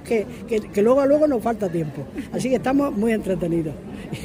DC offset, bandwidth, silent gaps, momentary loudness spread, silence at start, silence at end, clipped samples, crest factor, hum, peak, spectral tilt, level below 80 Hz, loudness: under 0.1%; 16 kHz; none; 12 LU; 0 s; 0 s; under 0.1%; 14 dB; none; -6 dBFS; -7 dB/octave; -48 dBFS; -22 LUFS